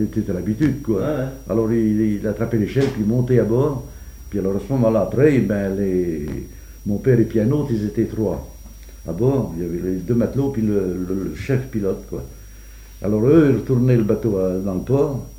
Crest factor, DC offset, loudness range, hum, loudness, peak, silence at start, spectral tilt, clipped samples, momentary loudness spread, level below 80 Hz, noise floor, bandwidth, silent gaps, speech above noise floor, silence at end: 18 dB; under 0.1%; 3 LU; none; -20 LUFS; -2 dBFS; 0 s; -8.5 dB/octave; under 0.1%; 12 LU; -38 dBFS; -39 dBFS; 16.5 kHz; none; 20 dB; 0 s